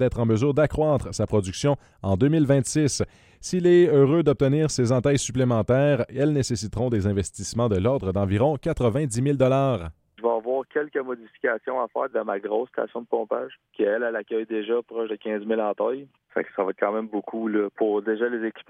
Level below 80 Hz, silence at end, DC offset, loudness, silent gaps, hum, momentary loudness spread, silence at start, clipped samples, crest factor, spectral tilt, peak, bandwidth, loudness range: -48 dBFS; 0.1 s; under 0.1%; -24 LUFS; none; none; 9 LU; 0 s; under 0.1%; 16 dB; -6.5 dB/octave; -6 dBFS; 12.5 kHz; 7 LU